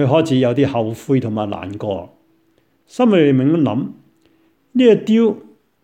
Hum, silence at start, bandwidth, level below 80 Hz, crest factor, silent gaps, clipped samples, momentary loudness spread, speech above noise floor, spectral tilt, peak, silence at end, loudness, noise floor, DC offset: none; 0 s; 10 kHz; -58 dBFS; 16 dB; none; under 0.1%; 12 LU; 45 dB; -7.5 dB/octave; 0 dBFS; 0.45 s; -16 LUFS; -60 dBFS; under 0.1%